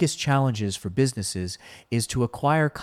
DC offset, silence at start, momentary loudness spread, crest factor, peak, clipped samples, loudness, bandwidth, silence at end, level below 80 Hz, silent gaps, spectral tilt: under 0.1%; 0 s; 9 LU; 14 dB; -10 dBFS; under 0.1%; -25 LUFS; 15 kHz; 0 s; -52 dBFS; none; -5 dB/octave